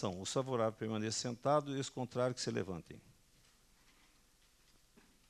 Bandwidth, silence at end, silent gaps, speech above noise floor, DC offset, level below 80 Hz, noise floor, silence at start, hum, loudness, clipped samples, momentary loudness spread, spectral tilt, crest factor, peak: 13 kHz; 2.3 s; none; 31 dB; under 0.1%; -72 dBFS; -69 dBFS; 0 s; none; -38 LUFS; under 0.1%; 11 LU; -4.5 dB/octave; 20 dB; -20 dBFS